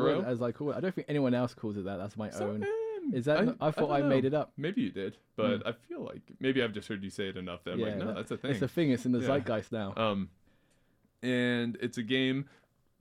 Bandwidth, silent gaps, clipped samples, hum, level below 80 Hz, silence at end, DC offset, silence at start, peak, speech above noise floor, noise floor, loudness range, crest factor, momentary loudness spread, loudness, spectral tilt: 14 kHz; none; under 0.1%; none; -68 dBFS; 0.55 s; under 0.1%; 0 s; -16 dBFS; 38 dB; -70 dBFS; 4 LU; 16 dB; 10 LU; -32 LUFS; -6.5 dB/octave